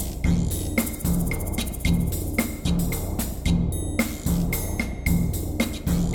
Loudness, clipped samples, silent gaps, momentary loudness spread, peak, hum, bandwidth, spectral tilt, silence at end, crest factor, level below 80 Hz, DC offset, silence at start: -25 LUFS; under 0.1%; none; 3 LU; -8 dBFS; none; over 20 kHz; -5.5 dB/octave; 0 s; 16 dB; -30 dBFS; under 0.1%; 0 s